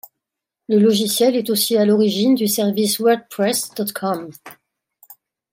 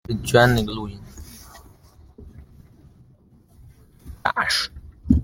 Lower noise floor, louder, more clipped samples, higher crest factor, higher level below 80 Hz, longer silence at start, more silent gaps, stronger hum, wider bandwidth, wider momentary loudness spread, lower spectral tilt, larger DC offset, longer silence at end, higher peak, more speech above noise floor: first, -83 dBFS vs -54 dBFS; first, -17 LUFS vs -21 LUFS; neither; second, 14 dB vs 24 dB; second, -70 dBFS vs -38 dBFS; first, 0.7 s vs 0.1 s; neither; neither; about the same, 16.5 kHz vs 17 kHz; second, 9 LU vs 26 LU; about the same, -4 dB/octave vs -5 dB/octave; neither; first, 0.4 s vs 0 s; second, -4 dBFS vs 0 dBFS; first, 66 dB vs 33 dB